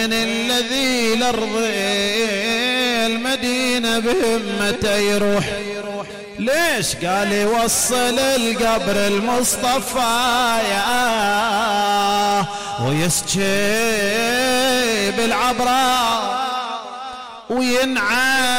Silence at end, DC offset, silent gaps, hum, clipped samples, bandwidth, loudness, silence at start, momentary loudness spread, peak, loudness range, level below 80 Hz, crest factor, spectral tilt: 0 s; under 0.1%; none; none; under 0.1%; 16.5 kHz; -18 LUFS; 0 s; 7 LU; -8 dBFS; 2 LU; -46 dBFS; 10 dB; -2.5 dB/octave